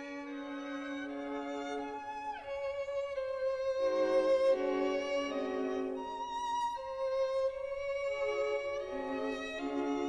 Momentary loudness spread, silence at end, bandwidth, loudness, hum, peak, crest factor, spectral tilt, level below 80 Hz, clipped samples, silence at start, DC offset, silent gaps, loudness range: 10 LU; 0 s; 10 kHz; -35 LUFS; none; -20 dBFS; 14 dB; -4 dB/octave; -66 dBFS; under 0.1%; 0 s; under 0.1%; none; 6 LU